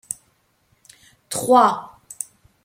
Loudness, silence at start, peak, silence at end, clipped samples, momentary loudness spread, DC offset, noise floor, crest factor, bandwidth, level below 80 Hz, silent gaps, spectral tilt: -18 LUFS; 0.1 s; -2 dBFS; 0.4 s; under 0.1%; 18 LU; under 0.1%; -64 dBFS; 20 dB; 16.5 kHz; -66 dBFS; none; -3.5 dB/octave